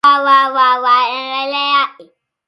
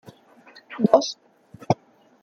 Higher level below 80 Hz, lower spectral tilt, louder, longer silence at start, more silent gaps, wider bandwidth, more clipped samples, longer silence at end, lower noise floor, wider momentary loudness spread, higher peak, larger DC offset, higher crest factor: about the same, -70 dBFS vs -66 dBFS; second, -1.5 dB/octave vs -6 dB/octave; first, -13 LUFS vs -23 LUFS; second, 0.05 s vs 0.7 s; neither; first, 11 kHz vs 7.2 kHz; neither; about the same, 0.45 s vs 0.5 s; second, -45 dBFS vs -51 dBFS; second, 9 LU vs 21 LU; about the same, 0 dBFS vs -2 dBFS; neither; second, 14 dB vs 24 dB